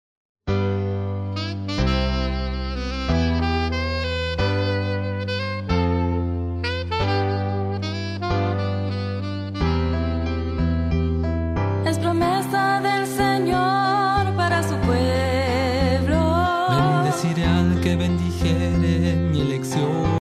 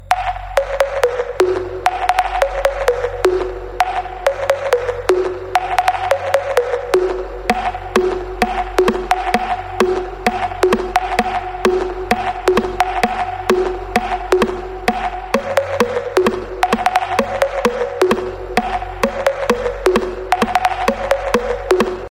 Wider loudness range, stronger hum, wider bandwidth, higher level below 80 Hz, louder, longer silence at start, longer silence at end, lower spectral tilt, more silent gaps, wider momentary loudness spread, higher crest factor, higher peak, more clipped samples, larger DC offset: first, 4 LU vs 1 LU; neither; second, 14.5 kHz vs 16.5 kHz; about the same, -32 dBFS vs -34 dBFS; second, -22 LUFS vs -18 LUFS; first, 0.45 s vs 0 s; about the same, 0 s vs 0.05 s; first, -6.5 dB/octave vs -4.5 dB/octave; neither; first, 7 LU vs 4 LU; about the same, 14 dB vs 16 dB; second, -6 dBFS vs 0 dBFS; neither; neither